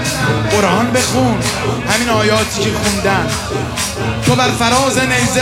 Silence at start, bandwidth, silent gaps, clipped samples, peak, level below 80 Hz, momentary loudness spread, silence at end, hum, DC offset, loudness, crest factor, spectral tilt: 0 s; 16.5 kHz; none; under 0.1%; -2 dBFS; -34 dBFS; 5 LU; 0 s; none; under 0.1%; -14 LUFS; 14 dB; -4 dB/octave